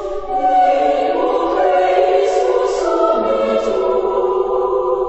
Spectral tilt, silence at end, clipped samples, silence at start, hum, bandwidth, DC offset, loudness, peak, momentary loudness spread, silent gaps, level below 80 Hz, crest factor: -4.5 dB/octave; 0 s; under 0.1%; 0 s; none; 8.4 kHz; 0.3%; -15 LUFS; -2 dBFS; 3 LU; none; -42 dBFS; 14 dB